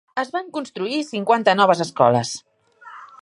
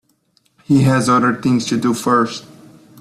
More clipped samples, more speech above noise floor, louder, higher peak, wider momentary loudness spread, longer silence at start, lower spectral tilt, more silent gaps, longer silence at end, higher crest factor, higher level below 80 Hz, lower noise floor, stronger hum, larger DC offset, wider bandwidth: neither; second, 25 dB vs 46 dB; second, -20 LUFS vs -15 LUFS; about the same, -2 dBFS vs -4 dBFS; first, 14 LU vs 5 LU; second, 0.15 s vs 0.7 s; second, -4.5 dB/octave vs -6 dB/octave; neither; second, 0.2 s vs 0.6 s; first, 20 dB vs 14 dB; second, -68 dBFS vs -52 dBFS; second, -45 dBFS vs -60 dBFS; neither; neither; second, 11.5 kHz vs 14 kHz